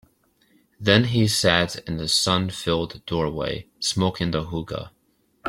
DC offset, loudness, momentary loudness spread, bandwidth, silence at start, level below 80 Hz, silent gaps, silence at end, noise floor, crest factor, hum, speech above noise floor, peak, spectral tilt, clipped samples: under 0.1%; -22 LUFS; 12 LU; 16.5 kHz; 0.8 s; -48 dBFS; none; 0 s; -66 dBFS; 22 dB; none; 43 dB; -2 dBFS; -4 dB/octave; under 0.1%